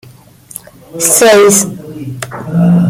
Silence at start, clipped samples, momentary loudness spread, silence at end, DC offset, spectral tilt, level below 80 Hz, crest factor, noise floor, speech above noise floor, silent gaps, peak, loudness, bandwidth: 0.95 s; 0.1%; 24 LU; 0 s; under 0.1%; -4.5 dB/octave; -48 dBFS; 12 dB; -37 dBFS; 29 dB; none; 0 dBFS; -8 LUFS; over 20 kHz